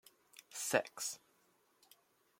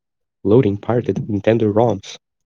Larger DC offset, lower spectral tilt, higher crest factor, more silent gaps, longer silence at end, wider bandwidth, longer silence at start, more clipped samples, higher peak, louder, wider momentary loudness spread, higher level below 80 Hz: neither; second, -2 dB/octave vs -8 dB/octave; first, 28 dB vs 18 dB; neither; first, 1.25 s vs 0.3 s; first, 16.5 kHz vs 7.4 kHz; about the same, 0.5 s vs 0.45 s; neither; second, -16 dBFS vs 0 dBFS; second, -39 LUFS vs -18 LUFS; first, 23 LU vs 11 LU; second, -88 dBFS vs -58 dBFS